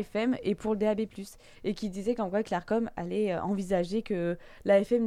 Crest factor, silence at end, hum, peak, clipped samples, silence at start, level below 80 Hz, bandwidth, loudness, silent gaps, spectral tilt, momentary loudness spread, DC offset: 16 dB; 0 s; none; -14 dBFS; under 0.1%; 0 s; -56 dBFS; 14 kHz; -30 LUFS; none; -7 dB/octave; 9 LU; under 0.1%